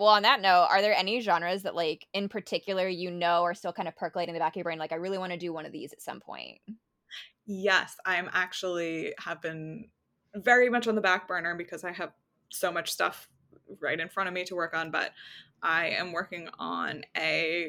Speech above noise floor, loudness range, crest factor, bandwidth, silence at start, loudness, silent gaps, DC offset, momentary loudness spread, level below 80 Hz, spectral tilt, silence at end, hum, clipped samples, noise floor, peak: 19 dB; 5 LU; 22 dB; 18 kHz; 0 s; -29 LUFS; none; under 0.1%; 19 LU; -80 dBFS; -3.5 dB/octave; 0 s; none; under 0.1%; -49 dBFS; -8 dBFS